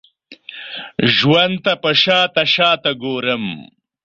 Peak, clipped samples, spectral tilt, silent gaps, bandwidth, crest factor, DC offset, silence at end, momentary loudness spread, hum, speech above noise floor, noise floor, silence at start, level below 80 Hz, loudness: 0 dBFS; under 0.1%; -5.5 dB/octave; none; 7.6 kHz; 16 dB; under 0.1%; 0.4 s; 17 LU; none; 24 dB; -40 dBFS; 0.3 s; -56 dBFS; -14 LUFS